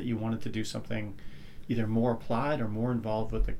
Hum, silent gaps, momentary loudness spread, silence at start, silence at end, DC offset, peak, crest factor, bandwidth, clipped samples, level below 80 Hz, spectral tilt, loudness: none; none; 13 LU; 0 s; 0 s; under 0.1%; -16 dBFS; 16 dB; 14 kHz; under 0.1%; -40 dBFS; -7 dB/octave; -32 LUFS